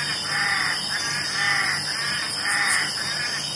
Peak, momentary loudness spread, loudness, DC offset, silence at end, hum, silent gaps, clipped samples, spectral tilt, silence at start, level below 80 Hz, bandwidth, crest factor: -8 dBFS; 4 LU; -22 LUFS; under 0.1%; 0 s; none; none; under 0.1%; -0.5 dB/octave; 0 s; -60 dBFS; 11.5 kHz; 18 dB